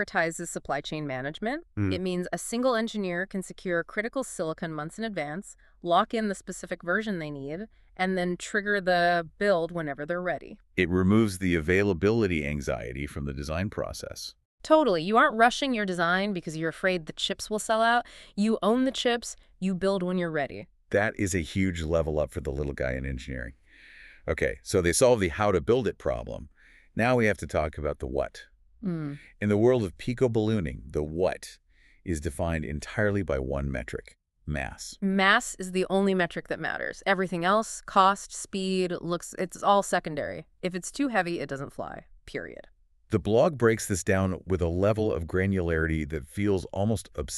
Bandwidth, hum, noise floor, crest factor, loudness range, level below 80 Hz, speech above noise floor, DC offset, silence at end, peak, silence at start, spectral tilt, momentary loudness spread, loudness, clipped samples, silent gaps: 13.5 kHz; none; -52 dBFS; 22 dB; 5 LU; -46 dBFS; 24 dB; under 0.1%; 0 s; -6 dBFS; 0 s; -5 dB/octave; 13 LU; -28 LUFS; under 0.1%; 14.45-14.58 s